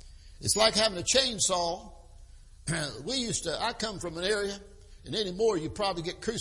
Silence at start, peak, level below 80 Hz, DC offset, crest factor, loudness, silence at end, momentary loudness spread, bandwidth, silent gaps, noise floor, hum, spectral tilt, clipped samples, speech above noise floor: 0.05 s; -8 dBFS; -50 dBFS; under 0.1%; 22 dB; -28 LUFS; 0 s; 11 LU; 11.5 kHz; none; -50 dBFS; none; -2.5 dB/octave; under 0.1%; 21 dB